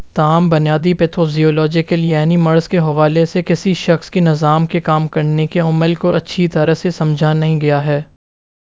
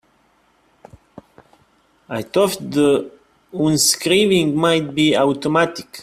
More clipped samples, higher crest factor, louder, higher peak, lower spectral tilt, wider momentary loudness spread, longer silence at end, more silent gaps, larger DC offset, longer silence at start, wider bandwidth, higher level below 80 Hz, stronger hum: neither; about the same, 14 dB vs 18 dB; first, -14 LUFS vs -17 LUFS; about the same, 0 dBFS vs -2 dBFS; first, -7.5 dB/octave vs -4 dB/octave; second, 3 LU vs 10 LU; first, 0.75 s vs 0 s; neither; first, 0.3% vs under 0.1%; second, 0 s vs 2.1 s; second, 7.8 kHz vs 16 kHz; first, -48 dBFS vs -56 dBFS; neither